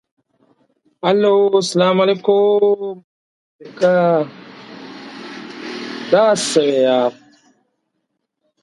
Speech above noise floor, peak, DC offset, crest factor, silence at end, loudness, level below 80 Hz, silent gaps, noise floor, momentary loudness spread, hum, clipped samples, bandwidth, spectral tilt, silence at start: 59 dB; 0 dBFS; under 0.1%; 18 dB; 1.5 s; -15 LUFS; -68 dBFS; 3.04-3.59 s; -73 dBFS; 20 LU; none; under 0.1%; 11.5 kHz; -4.5 dB/octave; 1.05 s